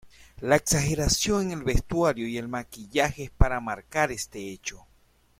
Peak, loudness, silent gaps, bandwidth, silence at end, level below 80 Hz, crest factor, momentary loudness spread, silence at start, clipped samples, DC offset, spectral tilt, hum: -2 dBFS; -27 LUFS; none; 16.5 kHz; 0.65 s; -34 dBFS; 24 dB; 12 LU; 0.05 s; under 0.1%; under 0.1%; -4 dB/octave; none